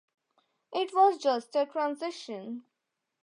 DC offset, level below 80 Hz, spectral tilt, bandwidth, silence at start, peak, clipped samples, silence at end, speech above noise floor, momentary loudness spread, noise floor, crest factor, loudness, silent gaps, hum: under 0.1%; under -90 dBFS; -3.5 dB/octave; 11 kHz; 0.7 s; -12 dBFS; under 0.1%; 0.65 s; 56 dB; 16 LU; -85 dBFS; 18 dB; -29 LUFS; none; none